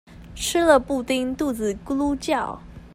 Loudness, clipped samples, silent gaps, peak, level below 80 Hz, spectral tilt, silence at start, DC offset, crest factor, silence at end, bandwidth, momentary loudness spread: -23 LUFS; under 0.1%; none; -4 dBFS; -44 dBFS; -4 dB/octave; 0.1 s; under 0.1%; 20 dB; 0.05 s; 16 kHz; 13 LU